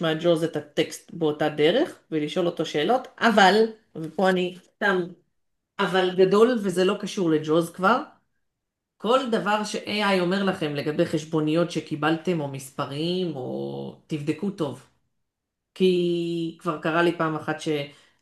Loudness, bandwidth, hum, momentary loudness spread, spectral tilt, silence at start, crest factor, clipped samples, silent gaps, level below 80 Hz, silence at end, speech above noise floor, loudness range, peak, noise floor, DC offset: -24 LUFS; 12.5 kHz; none; 11 LU; -5.5 dB/octave; 0 s; 20 dB; under 0.1%; none; -70 dBFS; 0.3 s; 58 dB; 6 LU; -4 dBFS; -82 dBFS; under 0.1%